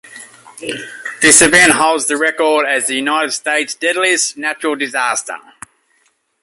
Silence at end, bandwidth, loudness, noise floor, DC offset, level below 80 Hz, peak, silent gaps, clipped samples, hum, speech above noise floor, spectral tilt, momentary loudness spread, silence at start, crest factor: 1 s; 16 kHz; -12 LUFS; -60 dBFS; under 0.1%; -52 dBFS; 0 dBFS; none; under 0.1%; none; 46 dB; -1 dB/octave; 18 LU; 0.05 s; 16 dB